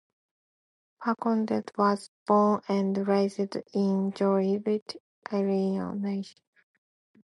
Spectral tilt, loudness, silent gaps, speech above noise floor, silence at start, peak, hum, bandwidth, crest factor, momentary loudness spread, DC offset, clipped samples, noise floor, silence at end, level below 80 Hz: -7.5 dB/octave; -28 LUFS; 2.08-2.26 s, 4.82-4.86 s, 5.00-5.22 s; over 63 dB; 1 s; -10 dBFS; none; 11.5 kHz; 18 dB; 9 LU; under 0.1%; under 0.1%; under -90 dBFS; 0.95 s; -74 dBFS